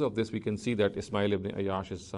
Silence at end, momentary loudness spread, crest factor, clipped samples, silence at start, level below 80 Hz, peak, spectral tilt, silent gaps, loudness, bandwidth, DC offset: 0 s; 4 LU; 16 dB; under 0.1%; 0 s; -60 dBFS; -14 dBFS; -6.5 dB/octave; none; -31 LUFS; 11.5 kHz; under 0.1%